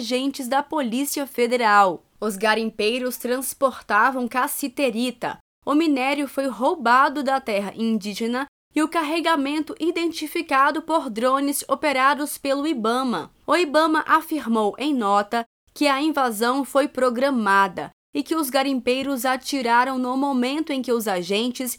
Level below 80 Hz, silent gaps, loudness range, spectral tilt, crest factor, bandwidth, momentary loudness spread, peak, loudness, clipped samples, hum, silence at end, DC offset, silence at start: -64 dBFS; 5.40-5.62 s, 8.48-8.71 s, 15.46-15.67 s, 17.93-18.13 s; 2 LU; -3.5 dB/octave; 18 dB; over 20 kHz; 7 LU; -4 dBFS; -22 LUFS; under 0.1%; none; 0 s; under 0.1%; 0 s